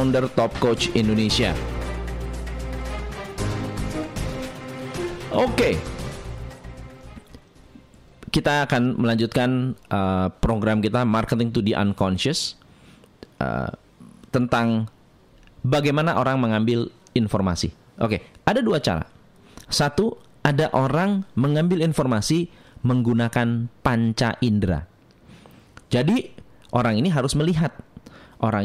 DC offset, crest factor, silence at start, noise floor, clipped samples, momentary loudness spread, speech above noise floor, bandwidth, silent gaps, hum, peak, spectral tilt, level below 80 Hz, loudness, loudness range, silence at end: under 0.1%; 20 dB; 0 s; -52 dBFS; under 0.1%; 12 LU; 32 dB; 15.5 kHz; none; none; -2 dBFS; -6 dB/octave; -40 dBFS; -23 LUFS; 6 LU; 0 s